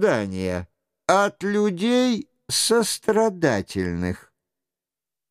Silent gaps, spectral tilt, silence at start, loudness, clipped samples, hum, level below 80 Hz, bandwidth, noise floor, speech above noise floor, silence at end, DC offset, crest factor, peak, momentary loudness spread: none; -4 dB/octave; 0 s; -22 LUFS; under 0.1%; none; -54 dBFS; 15.5 kHz; -89 dBFS; 67 dB; 1.1 s; under 0.1%; 20 dB; -4 dBFS; 9 LU